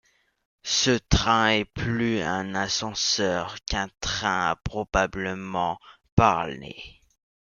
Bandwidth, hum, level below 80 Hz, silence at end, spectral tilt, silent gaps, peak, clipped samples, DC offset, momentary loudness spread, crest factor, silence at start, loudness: 10 kHz; none; -40 dBFS; 0.65 s; -3.5 dB/octave; 6.12-6.17 s; -2 dBFS; under 0.1%; under 0.1%; 11 LU; 24 dB; 0.65 s; -25 LUFS